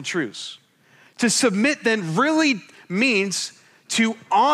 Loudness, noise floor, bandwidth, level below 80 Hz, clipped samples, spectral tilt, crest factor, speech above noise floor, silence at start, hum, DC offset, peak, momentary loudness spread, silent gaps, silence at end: -21 LUFS; -55 dBFS; 13.5 kHz; -76 dBFS; under 0.1%; -3.5 dB/octave; 16 dB; 34 dB; 0 s; none; under 0.1%; -6 dBFS; 11 LU; none; 0 s